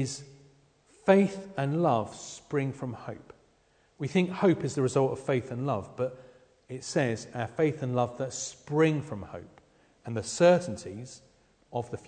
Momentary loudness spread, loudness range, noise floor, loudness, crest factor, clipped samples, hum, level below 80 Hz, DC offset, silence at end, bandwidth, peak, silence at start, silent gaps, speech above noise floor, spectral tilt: 18 LU; 2 LU; -66 dBFS; -29 LUFS; 20 dB; under 0.1%; none; -66 dBFS; under 0.1%; 0.1 s; 9.4 kHz; -8 dBFS; 0 s; none; 37 dB; -6 dB/octave